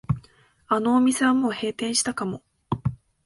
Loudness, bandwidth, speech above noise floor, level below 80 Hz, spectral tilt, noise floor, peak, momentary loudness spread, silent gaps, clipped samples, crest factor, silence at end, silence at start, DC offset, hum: -24 LUFS; 11.5 kHz; 34 dB; -50 dBFS; -4.5 dB/octave; -56 dBFS; -8 dBFS; 12 LU; none; under 0.1%; 16 dB; 0.3 s; 0.1 s; under 0.1%; none